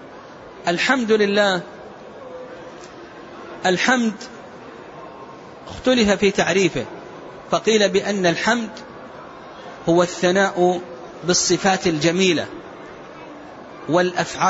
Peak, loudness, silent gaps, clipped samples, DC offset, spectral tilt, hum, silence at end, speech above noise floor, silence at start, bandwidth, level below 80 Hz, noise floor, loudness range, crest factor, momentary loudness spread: -4 dBFS; -19 LUFS; none; under 0.1%; under 0.1%; -4 dB/octave; none; 0 s; 21 dB; 0 s; 8 kHz; -54 dBFS; -39 dBFS; 6 LU; 18 dB; 21 LU